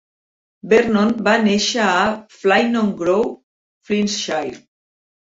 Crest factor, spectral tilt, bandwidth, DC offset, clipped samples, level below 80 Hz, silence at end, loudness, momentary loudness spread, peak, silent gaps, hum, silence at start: 16 dB; -4 dB/octave; 7.8 kHz; under 0.1%; under 0.1%; -56 dBFS; 0.65 s; -17 LUFS; 8 LU; -2 dBFS; 3.43-3.81 s; none; 0.65 s